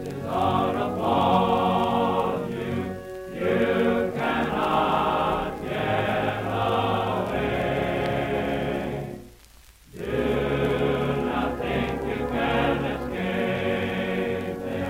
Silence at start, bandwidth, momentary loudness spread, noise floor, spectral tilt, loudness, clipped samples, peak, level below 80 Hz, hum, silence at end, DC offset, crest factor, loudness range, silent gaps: 0 s; 16 kHz; 7 LU; -51 dBFS; -7 dB/octave; -25 LUFS; under 0.1%; -6 dBFS; -44 dBFS; none; 0 s; under 0.1%; 18 dB; 3 LU; none